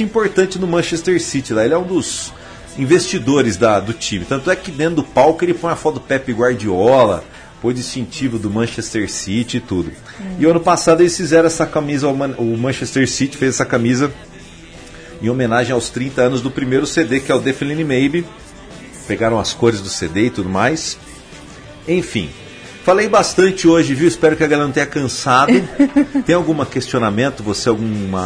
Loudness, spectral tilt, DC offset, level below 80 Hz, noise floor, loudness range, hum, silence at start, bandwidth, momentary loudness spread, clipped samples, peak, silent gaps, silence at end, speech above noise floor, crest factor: -16 LUFS; -5 dB/octave; under 0.1%; -42 dBFS; -37 dBFS; 5 LU; none; 0 s; 10.5 kHz; 12 LU; under 0.1%; -2 dBFS; none; 0 s; 22 dB; 14 dB